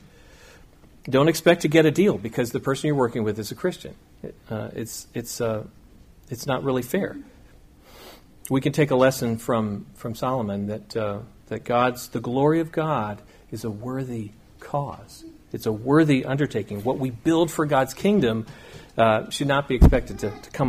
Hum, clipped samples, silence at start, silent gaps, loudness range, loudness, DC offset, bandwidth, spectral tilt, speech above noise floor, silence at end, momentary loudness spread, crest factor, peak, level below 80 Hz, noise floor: none; under 0.1%; 1.05 s; none; 8 LU; -23 LUFS; under 0.1%; 15.5 kHz; -6 dB/octave; 27 dB; 0 s; 19 LU; 20 dB; -4 dBFS; -34 dBFS; -50 dBFS